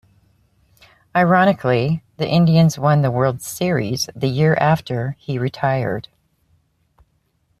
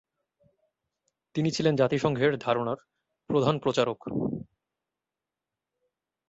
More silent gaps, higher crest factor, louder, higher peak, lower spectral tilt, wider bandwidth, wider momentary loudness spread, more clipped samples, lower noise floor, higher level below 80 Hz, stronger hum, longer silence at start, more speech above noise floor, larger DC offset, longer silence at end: neither; about the same, 16 dB vs 20 dB; first, -18 LUFS vs -27 LUFS; first, -2 dBFS vs -10 dBFS; about the same, -6.5 dB/octave vs -6 dB/octave; first, 14.5 kHz vs 8 kHz; about the same, 10 LU vs 9 LU; neither; second, -65 dBFS vs -89 dBFS; first, -52 dBFS vs -64 dBFS; neither; second, 1.15 s vs 1.35 s; second, 48 dB vs 63 dB; neither; second, 1.6 s vs 1.85 s